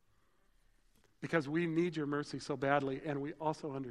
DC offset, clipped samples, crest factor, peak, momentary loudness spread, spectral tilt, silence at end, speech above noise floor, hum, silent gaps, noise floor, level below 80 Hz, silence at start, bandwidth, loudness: under 0.1%; under 0.1%; 22 dB; -16 dBFS; 7 LU; -6.5 dB/octave; 0 s; 38 dB; none; none; -74 dBFS; -72 dBFS; 1.2 s; 11.5 kHz; -37 LUFS